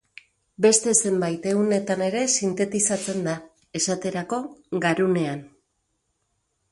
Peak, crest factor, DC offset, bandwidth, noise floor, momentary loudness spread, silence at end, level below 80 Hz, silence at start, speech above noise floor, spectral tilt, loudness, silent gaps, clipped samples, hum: -4 dBFS; 22 dB; under 0.1%; 11.5 kHz; -74 dBFS; 11 LU; 1.25 s; -66 dBFS; 0.6 s; 51 dB; -3.5 dB/octave; -23 LUFS; none; under 0.1%; none